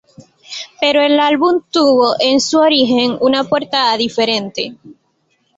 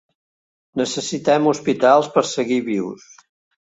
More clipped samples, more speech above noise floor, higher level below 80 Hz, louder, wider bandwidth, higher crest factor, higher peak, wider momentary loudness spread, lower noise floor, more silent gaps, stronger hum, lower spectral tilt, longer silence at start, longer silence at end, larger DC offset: neither; second, 49 dB vs over 72 dB; first, -58 dBFS vs -64 dBFS; first, -13 LUFS vs -19 LUFS; about the same, 8 kHz vs 8.2 kHz; about the same, 14 dB vs 18 dB; about the same, -2 dBFS vs -2 dBFS; about the same, 12 LU vs 13 LU; second, -62 dBFS vs under -90 dBFS; neither; neither; about the same, -3.5 dB/octave vs -4.5 dB/octave; second, 0.5 s vs 0.75 s; about the same, 0.65 s vs 0.65 s; neither